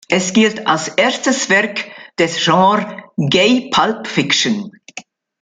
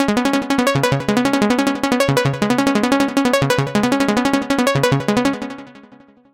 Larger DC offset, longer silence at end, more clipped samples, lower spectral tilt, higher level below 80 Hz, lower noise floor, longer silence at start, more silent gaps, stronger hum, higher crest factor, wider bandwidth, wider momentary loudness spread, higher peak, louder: neither; second, 0.4 s vs 0.55 s; neither; second, -3.5 dB/octave vs -5 dB/octave; second, -58 dBFS vs -46 dBFS; second, -37 dBFS vs -46 dBFS; about the same, 0.1 s vs 0 s; neither; neither; about the same, 14 dB vs 14 dB; second, 9.6 kHz vs 17 kHz; first, 13 LU vs 2 LU; about the same, -2 dBFS vs -2 dBFS; about the same, -15 LUFS vs -17 LUFS